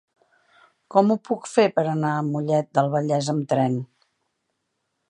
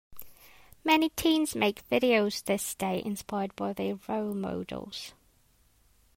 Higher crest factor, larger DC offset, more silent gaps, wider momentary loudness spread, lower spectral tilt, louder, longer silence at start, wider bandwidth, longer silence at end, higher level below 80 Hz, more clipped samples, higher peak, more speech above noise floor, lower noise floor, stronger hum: about the same, 20 dB vs 20 dB; neither; neither; second, 5 LU vs 14 LU; first, -6.5 dB/octave vs -4 dB/octave; first, -22 LUFS vs -29 LUFS; first, 0.9 s vs 0.1 s; second, 10.5 kHz vs 16 kHz; first, 1.25 s vs 1.05 s; second, -72 dBFS vs -60 dBFS; neither; first, -4 dBFS vs -10 dBFS; first, 55 dB vs 36 dB; first, -76 dBFS vs -65 dBFS; neither